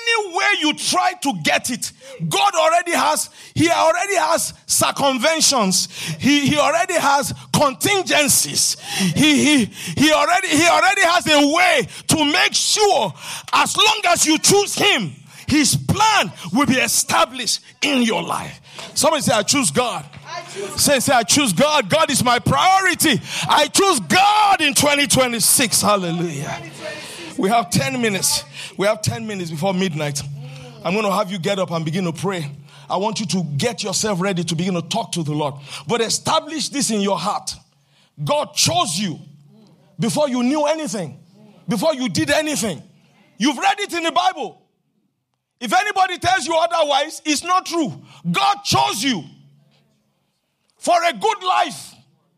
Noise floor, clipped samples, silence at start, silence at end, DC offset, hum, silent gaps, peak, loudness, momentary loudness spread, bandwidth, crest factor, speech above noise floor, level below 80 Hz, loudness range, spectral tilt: -73 dBFS; under 0.1%; 0 s; 0.5 s; under 0.1%; none; none; -2 dBFS; -17 LUFS; 13 LU; 15.5 kHz; 16 dB; 55 dB; -54 dBFS; 7 LU; -3 dB/octave